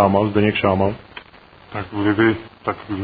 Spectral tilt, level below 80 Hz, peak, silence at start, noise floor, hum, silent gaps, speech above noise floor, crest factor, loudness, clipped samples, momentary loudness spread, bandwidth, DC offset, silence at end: -10 dB/octave; -48 dBFS; -2 dBFS; 0 s; -46 dBFS; none; none; 27 dB; 18 dB; -19 LUFS; under 0.1%; 17 LU; 4.9 kHz; under 0.1%; 0 s